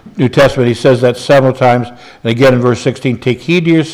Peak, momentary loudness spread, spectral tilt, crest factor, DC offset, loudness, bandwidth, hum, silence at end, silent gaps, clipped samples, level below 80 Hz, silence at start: 0 dBFS; 7 LU; -6.5 dB/octave; 10 dB; under 0.1%; -11 LUFS; 14 kHz; none; 0 s; none; under 0.1%; -42 dBFS; 0.05 s